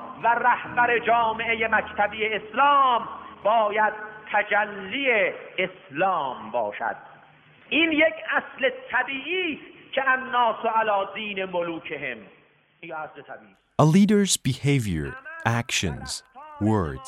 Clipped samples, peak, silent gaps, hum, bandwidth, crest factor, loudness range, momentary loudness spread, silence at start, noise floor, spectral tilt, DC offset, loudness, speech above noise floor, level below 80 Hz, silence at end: under 0.1%; -4 dBFS; none; none; 15.5 kHz; 20 dB; 4 LU; 13 LU; 0 s; -53 dBFS; -4.5 dB/octave; under 0.1%; -23 LUFS; 30 dB; -54 dBFS; 0 s